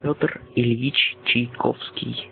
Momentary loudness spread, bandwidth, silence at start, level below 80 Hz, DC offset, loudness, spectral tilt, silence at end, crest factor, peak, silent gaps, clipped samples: 10 LU; 4.6 kHz; 0 s; -58 dBFS; under 0.1%; -22 LUFS; -10 dB/octave; 0 s; 20 dB; -4 dBFS; none; under 0.1%